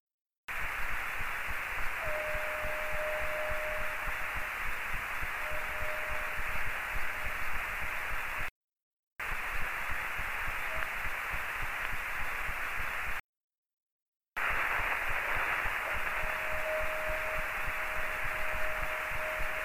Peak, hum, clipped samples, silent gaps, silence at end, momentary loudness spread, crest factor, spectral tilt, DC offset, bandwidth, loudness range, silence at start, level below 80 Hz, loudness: -16 dBFS; none; under 0.1%; 8.51-8.68 s, 8.82-8.91 s, 8.99-9.16 s, 13.20-13.50 s, 13.58-13.63 s, 13.73-14.13 s, 14.28-14.32 s; 0 s; 4 LU; 16 dB; -3 dB/octave; under 0.1%; 15.5 kHz; 4 LU; 0.5 s; -44 dBFS; -34 LUFS